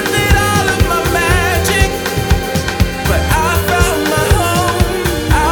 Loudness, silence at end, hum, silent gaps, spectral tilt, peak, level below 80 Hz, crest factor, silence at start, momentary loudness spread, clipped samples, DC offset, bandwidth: -13 LUFS; 0 s; none; none; -4.5 dB/octave; 0 dBFS; -20 dBFS; 12 dB; 0 s; 4 LU; under 0.1%; under 0.1%; over 20 kHz